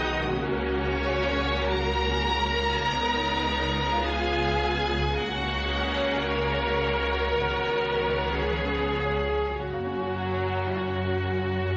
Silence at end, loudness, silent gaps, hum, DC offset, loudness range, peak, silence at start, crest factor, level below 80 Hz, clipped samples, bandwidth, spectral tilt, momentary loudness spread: 0 s; -26 LUFS; none; none; under 0.1%; 2 LU; -14 dBFS; 0 s; 12 dB; -34 dBFS; under 0.1%; 7.8 kHz; -6 dB/octave; 3 LU